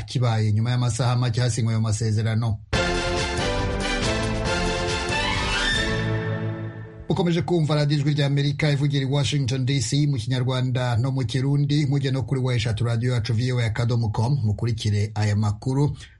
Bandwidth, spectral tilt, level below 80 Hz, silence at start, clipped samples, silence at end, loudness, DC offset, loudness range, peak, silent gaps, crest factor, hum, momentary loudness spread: 11.5 kHz; -5.5 dB/octave; -38 dBFS; 0 s; under 0.1%; 0.1 s; -23 LUFS; under 0.1%; 2 LU; -8 dBFS; none; 14 dB; none; 3 LU